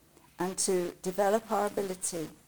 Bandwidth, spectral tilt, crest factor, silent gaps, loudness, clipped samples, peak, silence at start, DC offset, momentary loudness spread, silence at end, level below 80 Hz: over 20 kHz; -3.5 dB/octave; 18 dB; none; -31 LUFS; under 0.1%; -14 dBFS; 0.4 s; under 0.1%; 7 LU; 0.15 s; -66 dBFS